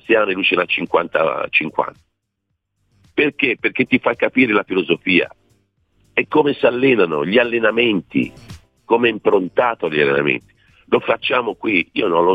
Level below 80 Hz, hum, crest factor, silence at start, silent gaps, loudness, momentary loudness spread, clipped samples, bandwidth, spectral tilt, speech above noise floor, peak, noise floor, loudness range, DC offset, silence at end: -56 dBFS; none; 16 dB; 0.1 s; none; -17 LUFS; 7 LU; under 0.1%; 6 kHz; -7 dB/octave; 56 dB; -2 dBFS; -73 dBFS; 3 LU; under 0.1%; 0 s